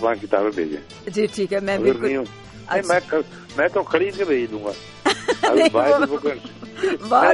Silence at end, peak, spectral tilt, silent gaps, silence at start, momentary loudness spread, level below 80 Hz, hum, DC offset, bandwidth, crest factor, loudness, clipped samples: 0 s; -2 dBFS; -4.5 dB/octave; none; 0 s; 13 LU; -56 dBFS; none; under 0.1%; 11.5 kHz; 18 dB; -21 LUFS; under 0.1%